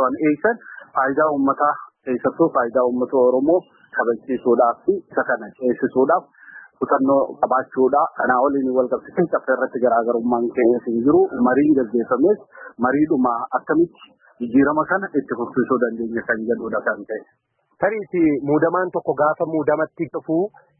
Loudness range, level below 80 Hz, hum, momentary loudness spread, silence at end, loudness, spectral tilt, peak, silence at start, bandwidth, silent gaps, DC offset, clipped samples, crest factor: 3 LU; -60 dBFS; none; 7 LU; 0.3 s; -20 LUFS; -12.5 dB/octave; -4 dBFS; 0 s; 3.1 kHz; none; under 0.1%; under 0.1%; 16 dB